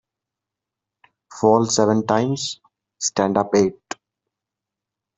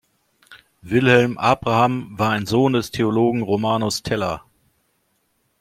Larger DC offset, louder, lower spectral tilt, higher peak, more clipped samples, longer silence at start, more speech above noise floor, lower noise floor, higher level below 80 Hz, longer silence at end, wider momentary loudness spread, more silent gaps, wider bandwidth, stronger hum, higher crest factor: neither; about the same, -19 LUFS vs -19 LUFS; about the same, -4.5 dB/octave vs -5.5 dB/octave; about the same, -2 dBFS vs -2 dBFS; neither; first, 1.3 s vs 0.5 s; first, 67 dB vs 49 dB; first, -86 dBFS vs -67 dBFS; second, -60 dBFS vs -52 dBFS; first, 1.45 s vs 1.25 s; first, 19 LU vs 7 LU; neither; second, 8.2 kHz vs 15.5 kHz; neither; about the same, 20 dB vs 20 dB